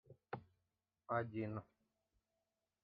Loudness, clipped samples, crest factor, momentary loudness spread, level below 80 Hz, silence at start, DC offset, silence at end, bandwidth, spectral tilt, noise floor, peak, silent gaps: -46 LUFS; under 0.1%; 24 dB; 11 LU; -82 dBFS; 0.1 s; under 0.1%; 1.2 s; 4.9 kHz; -7 dB/octave; under -90 dBFS; -26 dBFS; none